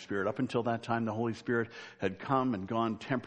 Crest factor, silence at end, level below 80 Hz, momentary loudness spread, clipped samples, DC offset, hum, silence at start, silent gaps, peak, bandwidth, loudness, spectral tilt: 18 dB; 0 s; -70 dBFS; 6 LU; under 0.1%; under 0.1%; none; 0 s; none; -14 dBFS; 9 kHz; -33 LUFS; -7 dB/octave